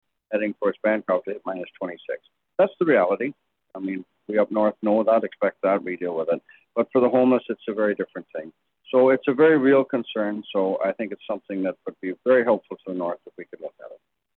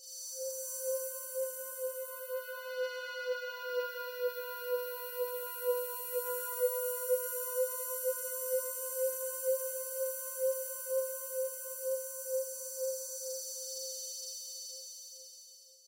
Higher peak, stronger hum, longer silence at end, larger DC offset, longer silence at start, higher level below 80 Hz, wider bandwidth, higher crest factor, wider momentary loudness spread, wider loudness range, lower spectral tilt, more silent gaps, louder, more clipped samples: first, -6 dBFS vs -20 dBFS; neither; first, 0.45 s vs 0.05 s; neither; first, 0.3 s vs 0 s; first, -76 dBFS vs under -90 dBFS; second, 4.2 kHz vs 16.5 kHz; about the same, 16 dB vs 18 dB; first, 16 LU vs 7 LU; about the same, 4 LU vs 4 LU; first, -9 dB/octave vs 5 dB/octave; neither; first, -23 LUFS vs -36 LUFS; neither